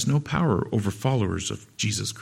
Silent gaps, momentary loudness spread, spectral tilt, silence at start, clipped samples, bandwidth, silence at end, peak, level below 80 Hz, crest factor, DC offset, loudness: none; 5 LU; -5 dB/octave; 0 s; under 0.1%; 15.5 kHz; 0 s; -8 dBFS; -50 dBFS; 16 dB; under 0.1%; -26 LUFS